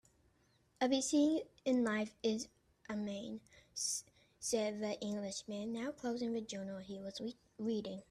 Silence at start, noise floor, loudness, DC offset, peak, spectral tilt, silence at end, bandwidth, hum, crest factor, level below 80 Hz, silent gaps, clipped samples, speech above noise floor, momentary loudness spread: 0.8 s; -74 dBFS; -39 LUFS; under 0.1%; -22 dBFS; -3.5 dB/octave; 0.1 s; 13.5 kHz; none; 18 dB; -74 dBFS; none; under 0.1%; 35 dB; 13 LU